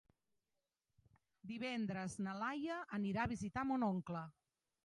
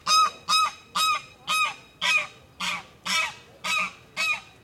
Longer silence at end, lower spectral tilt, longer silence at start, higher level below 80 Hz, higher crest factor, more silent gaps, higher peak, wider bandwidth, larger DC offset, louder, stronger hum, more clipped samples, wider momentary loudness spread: first, 0.55 s vs 0.2 s; first, -6 dB/octave vs 0.5 dB/octave; first, 1.45 s vs 0.05 s; about the same, -68 dBFS vs -66 dBFS; about the same, 18 dB vs 18 dB; neither; second, -26 dBFS vs -10 dBFS; second, 11 kHz vs 17 kHz; neither; second, -42 LUFS vs -25 LUFS; neither; neither; about the same, 9 LU vs 9 LU